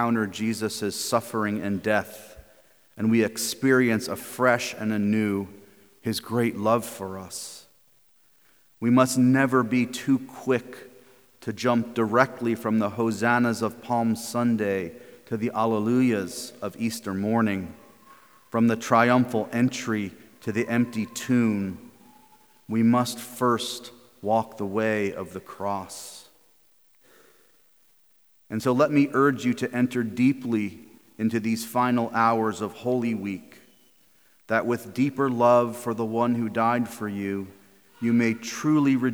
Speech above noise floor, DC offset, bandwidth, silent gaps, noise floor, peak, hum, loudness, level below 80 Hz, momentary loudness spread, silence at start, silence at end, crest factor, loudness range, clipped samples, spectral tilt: 38 dB; under 0.1%; over 20 kHz; none; -63 dBFS; -4 dBFS; none; -25 LUFS; -68 dBFS; 14 LU; 0 s; 0 s; 22 dB; 4 LU; under 0.1%; -5.5 dB/octave